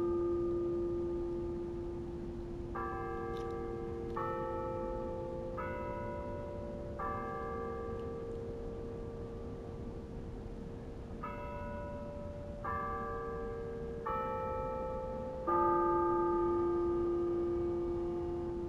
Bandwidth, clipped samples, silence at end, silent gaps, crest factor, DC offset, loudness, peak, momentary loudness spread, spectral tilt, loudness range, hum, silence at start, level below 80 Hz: 7.2 kHz; under 0.1%; 0 s; none; 18 dB; under 0.1%; -38 LUFS; -20 dBFS; 12 LU; -9 dB/octave; 11 LU; none; 0 s; -50 dBFS